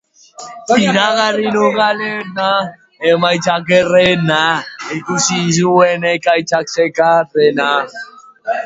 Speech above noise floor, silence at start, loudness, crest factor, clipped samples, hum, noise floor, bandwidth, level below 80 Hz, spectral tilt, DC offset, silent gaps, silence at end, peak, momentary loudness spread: 22 dB; 0.4 s; -13 LUFS; 14 dB; under 0.1%; none; -35 dBFS; 8 kHz; -54 dBFS; -4 dB/octave; under 0.1%; none; 0 s; 0 dBFS; 13 LU